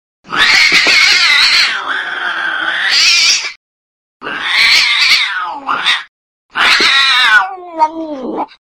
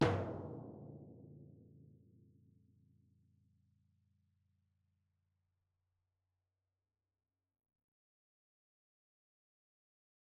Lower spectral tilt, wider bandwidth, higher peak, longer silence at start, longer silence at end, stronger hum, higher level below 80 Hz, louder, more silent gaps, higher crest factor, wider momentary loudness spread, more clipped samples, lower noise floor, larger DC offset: second, 1 dB/octave vs -5.5 dB/octave; first, 18.5 kHz vs 3.1 kHz; first, 0 dBFS vs -18 dBFS; first, 0.3 s vs 0 s; second, 0.35 s vs 8.25 s; neither; first, -50 dBFS vs -70 dBFS; first, -9 LUFS vs -44 LUFS; first, 3.56-4.20 s, 6.08-6.49 s vs none; second, 12 dB vs 32 dB; second, 15 LU vs 23 LU; first, 0.2% vs under 0.1%; about the same, under -90 dBFS vs under -90 dBFS; neither